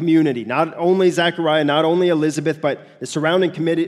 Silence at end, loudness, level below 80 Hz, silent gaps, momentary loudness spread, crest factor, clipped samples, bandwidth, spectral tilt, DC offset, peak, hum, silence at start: 0 s; -18 LUFS; -68 dBFS; none; 6 LU; 14 dB; under 0.1%; 12.5 kHz; -5.5 dB/octave; under 0.1%; -2 dBFS; none; 0 s